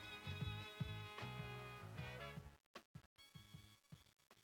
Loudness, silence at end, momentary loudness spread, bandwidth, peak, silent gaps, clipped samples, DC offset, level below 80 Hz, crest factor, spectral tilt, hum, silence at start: -52 LUFS; 0 s; 16 LU; 18 kHz; -34 dBFS; 2.66-2.74 s, 2.85-2.94 s, 3.06-3.16 s; under 0.1%; under 0.1%; -68 dBFS; 20 dB; -5.5 dB/octave; none; 0 s